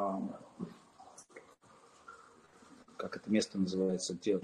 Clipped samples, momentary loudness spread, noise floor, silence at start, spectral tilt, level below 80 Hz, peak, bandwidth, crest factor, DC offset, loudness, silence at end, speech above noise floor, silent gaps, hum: under 0.1%; 24 LU; -62 dBFS; 0 s; -5 dB/octave; -76 dBFS; -18 dBFS; 11 kHz; 20 dB; under 0.1%; -37 LUFS; 0 s; 28 dB; none; none